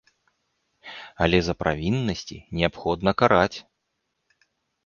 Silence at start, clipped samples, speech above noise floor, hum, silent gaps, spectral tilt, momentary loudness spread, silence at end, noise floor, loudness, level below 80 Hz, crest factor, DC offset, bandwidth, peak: 0.85 s; under 0.1%; 54 dB; none; none; -6 dB/octave; 21 LU; 1.25 s; -77 dBFS; -23 LUFS; -44 dBFS; 22 dB; under 0.1%; 7.2 kHz; -2 dBFS